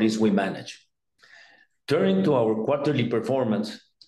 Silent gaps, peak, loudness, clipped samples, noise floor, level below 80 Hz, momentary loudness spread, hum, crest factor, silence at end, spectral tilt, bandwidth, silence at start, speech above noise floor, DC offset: none; -10 dBFS; -24 LUFS; under 0.1%; -58 dBFS; -68 dBFS; 14 LU; none; 16 dB; 0.3 s; -6.5 dB/octave; 12 kHz; 0 s; 35 dB; under 0.1%